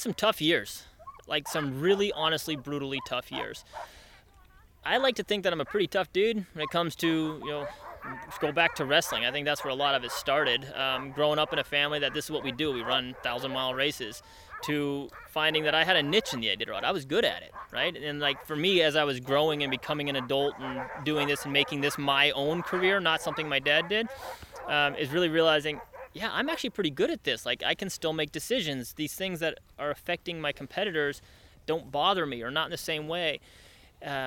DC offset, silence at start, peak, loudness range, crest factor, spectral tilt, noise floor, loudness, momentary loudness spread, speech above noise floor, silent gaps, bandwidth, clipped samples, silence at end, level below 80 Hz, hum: under 0.1%; 0 s; -8 dBFS; 5 LU; 22 dB; -3.5 dB/octave; -57 dBFS; -28 LUFS; 12 LU; 28 dB; none; 18 kHz; under 0.1%; 0 s; -60 dBFS; none